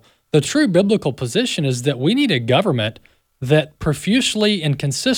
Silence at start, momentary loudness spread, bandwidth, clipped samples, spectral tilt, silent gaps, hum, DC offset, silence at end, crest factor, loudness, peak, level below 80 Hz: 0.35 s; 6 LU; 19 kHz; under 0.1%; -5 dB/octave; none; none; under 0.1%; 0 s; 16 dB; -18 LUFS; -2 dBFS; -48 dBFS